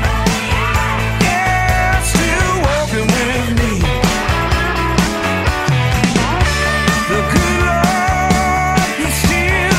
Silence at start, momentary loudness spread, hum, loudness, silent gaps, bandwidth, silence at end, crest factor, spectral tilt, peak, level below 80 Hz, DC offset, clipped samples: 0 s; 2 LU; none; -14 LUFS; none; 16 kHz; 0 s; 14 dB; -4.5 dB/octave; 0 dBFS; -22 dBFS; under 0.1%; under 0.1%